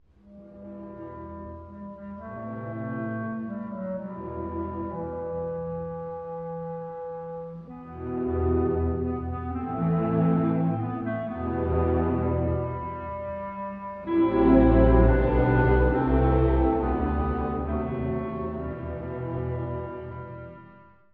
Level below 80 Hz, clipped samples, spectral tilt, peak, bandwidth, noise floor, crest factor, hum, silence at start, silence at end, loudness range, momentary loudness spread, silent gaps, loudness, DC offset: -34 dBFS; under 0.1%; -12 dB/octave; -6 dBFS; 4.3 kHz; -52 dBFS; 20 dB; none; 0.25 s; 0.3 s; 13 LU; 18 LU; none; -27 LUFS; under 0.1%